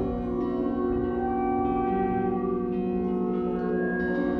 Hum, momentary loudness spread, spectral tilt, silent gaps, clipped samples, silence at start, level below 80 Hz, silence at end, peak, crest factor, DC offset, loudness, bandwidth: none; 2 LU; -10.5 dB/octave; none; under 0.1%; 0 s; -44 dBFS; 0 s; -14 dBFS; 12 dB; under 0.1%; -27 LUFS; 4.8 kHz